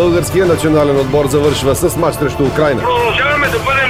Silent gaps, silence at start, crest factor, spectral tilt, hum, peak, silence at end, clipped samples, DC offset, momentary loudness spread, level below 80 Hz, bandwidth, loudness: none; 0 s; 12 dB; -5 dB/octave; none; 0 dBFS; 0 s; under 0.1%; 0.8%; 3 LU; -32 dBFS; 19 kHz; -13 LUFS